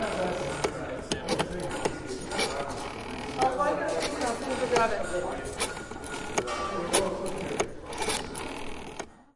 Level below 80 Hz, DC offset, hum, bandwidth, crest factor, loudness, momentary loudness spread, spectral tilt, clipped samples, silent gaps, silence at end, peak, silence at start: -48 dBFS; under 0.1%; none; 11.5 kHz; 22 dB; -31 LUFS; 10 LU; -3.5 dB/octave; under 0.1%; none; 0.1 s; -10 dBFS; 0 s